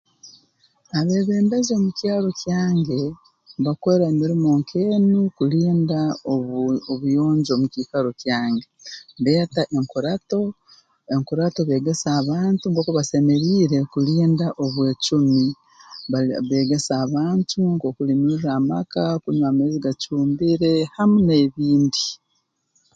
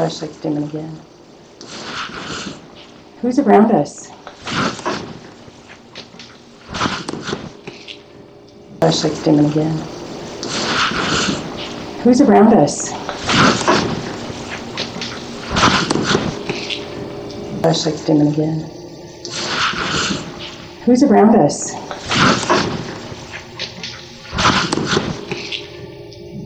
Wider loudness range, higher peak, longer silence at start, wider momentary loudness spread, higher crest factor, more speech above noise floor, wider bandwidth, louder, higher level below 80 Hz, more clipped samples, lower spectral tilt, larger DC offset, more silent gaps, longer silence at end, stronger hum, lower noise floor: second, 3 LU vs 10 LU; second, -6 dBFS vs 0 dBFS; first, 0.25 s vs 0 s; second, 7 LU vs 21 LU; about the same, 14 dB vs 18 dB; first, 51 dB vs 27 dB; about the same, 9.2 kHz vs 9.4 kHz; second, -20 LUFS vs -17 LUFS; second, -58 dBFS vs -44 dBFS; neither; first, -6.5 dB/octave vs -4.5 dB/octave; neither; neither; first, 0.8 s vs 0 s; neither; first, -70 dBFS vs -41 dBFS